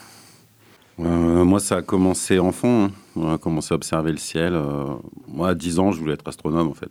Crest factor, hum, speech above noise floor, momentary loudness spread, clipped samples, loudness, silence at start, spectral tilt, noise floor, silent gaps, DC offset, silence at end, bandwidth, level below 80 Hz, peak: 18 dB; none; 32 dB; 10 LU; under 0.1%; -21 LUFS; 0 s; -6 dB/octave; -53 dBFS; none; under 0.1%; 0 s; 16 kHz; -44 dBFS; -4 dBFS